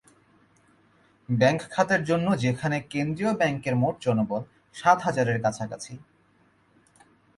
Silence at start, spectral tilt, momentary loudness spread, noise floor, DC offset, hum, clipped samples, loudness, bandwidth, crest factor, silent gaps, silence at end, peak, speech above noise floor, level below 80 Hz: 1.3 s; -6 dB/octave; 12 LU; -63 dBFS; under 0.1%; none; under 0.1%; -25 LUFS; 11.5 kHz; 22 dB; none; 1.4 s; -6 dBFS; 38 dB; -62 dBFS